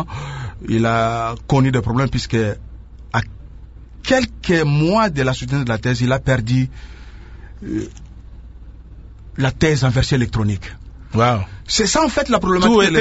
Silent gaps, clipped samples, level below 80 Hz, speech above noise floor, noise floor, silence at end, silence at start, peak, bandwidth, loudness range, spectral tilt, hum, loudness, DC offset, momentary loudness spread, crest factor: none; under 0.1%; -34 dBFS; 21 dB; -38 dBFS; 0 s; 0 s; 0 dBFS; 8 kHz; 5 LU; -5.5 dB/octave; none; -18 LUFS; under 0.1%; 14 LU; 18 dB